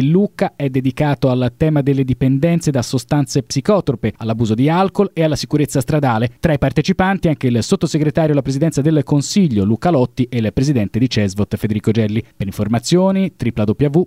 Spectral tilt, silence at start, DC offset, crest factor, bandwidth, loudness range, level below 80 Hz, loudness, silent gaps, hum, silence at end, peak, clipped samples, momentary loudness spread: -6.5 dB/octave; 0 s; 0.1%; 16 dB; 15.5 kHz; 1 LU; -40 dBFS; -16 LUFS; none; none; 0 s; 0 dBFS; under 0.1%; 5 LU